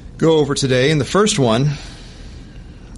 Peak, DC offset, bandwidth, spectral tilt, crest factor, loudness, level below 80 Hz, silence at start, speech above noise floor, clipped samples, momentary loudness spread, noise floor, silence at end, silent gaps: -4 dBFS; under 0.1%; 11.5 kHz; -5 dB/octave; 14 dB; -15 LUFS; -38 dBFS; 0 s; 21 dB; under 0.1%; 22 LU; -36 dBFS; 0 s; none